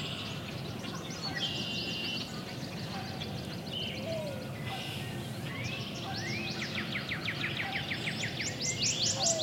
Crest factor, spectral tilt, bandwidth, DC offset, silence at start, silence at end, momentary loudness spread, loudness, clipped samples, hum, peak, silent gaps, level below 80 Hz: 18 dB; -3 dB/octave; 16 kHz; under 0.1%; 0 s; 0 s; 9 LU; -34 LUFS; under 0.1%; none; -18 dBFS; none; -60 dBFS